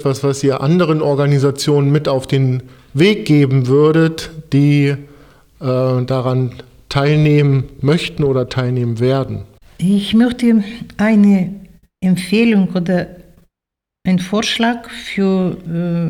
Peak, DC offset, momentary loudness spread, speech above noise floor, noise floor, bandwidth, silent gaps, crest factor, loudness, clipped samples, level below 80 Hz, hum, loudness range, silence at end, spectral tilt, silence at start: -2 dBFS; under 0.1%; 11 LU; 69 dB; -83 dBFS; 13.5 kHz; none; 14 dB; -15 LUFS; under 0.1%; -44 dBFS; none; 3 LU; 0 s; -7 dB/octave; 0 s